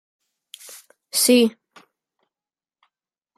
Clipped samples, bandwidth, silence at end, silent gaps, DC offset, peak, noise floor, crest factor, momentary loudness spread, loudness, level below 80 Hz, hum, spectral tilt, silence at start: under 0.1%; 15.5 kHz; 1.9 s; none; under 0.1%; -6 dBFS; under -90 dBFS; 20 dB; 26 LU; -18 LUFS; -78 dBFS; none; -2 dB/octave; 1.15 s